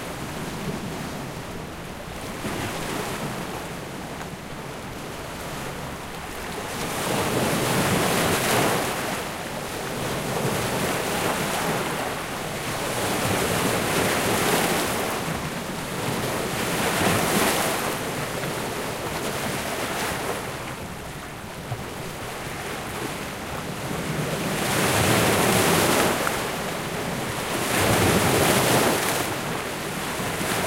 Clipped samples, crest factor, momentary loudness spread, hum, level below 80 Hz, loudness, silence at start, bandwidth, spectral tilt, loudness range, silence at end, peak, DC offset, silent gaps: under 0.1%; 20 dB; 14 LU; none; -46 dBFS; -25 LUFS; 0 s; 16 kHz; -3.5 dB/octave; 10 LU; 0 s; -4 dBFS; under 0.1%; none